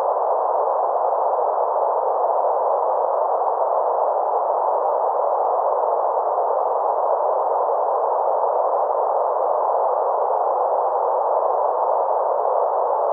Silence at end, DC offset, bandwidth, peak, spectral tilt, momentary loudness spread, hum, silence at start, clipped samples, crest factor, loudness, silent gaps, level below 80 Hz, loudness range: 0 s; under 0.1%; 2.2 kHz; -6 dBFS; 7.5 dB/octave; 1 LU; none; 0 s; under 0.1%; 14 dB; -20 LUFS; none; under -90 dBFS; 0 LU